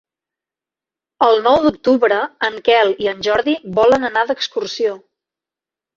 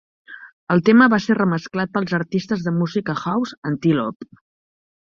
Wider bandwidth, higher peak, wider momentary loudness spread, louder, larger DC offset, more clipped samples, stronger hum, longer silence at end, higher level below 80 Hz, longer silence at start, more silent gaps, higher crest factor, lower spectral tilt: about the same, 7.4 kHz vs 7.2 kHz; about the same, 0 dBFS vs -2 dBFS; second, 7 LU vs 12 LU; first, -16 LUFS vs -19 LUFS; neither; neither; neither; first, 1 s vs 0.8 s; first, -54 dBFS vs -60 dBFS; first, 1.2 s vs 0.3 s; second, none vs 0.53-0.67 s, 3.57-3.62 s, 4.16-4.20 s; about the same, 16 dB vs 18 dB; second, -4.5 dB/octave vs -7 dB/octave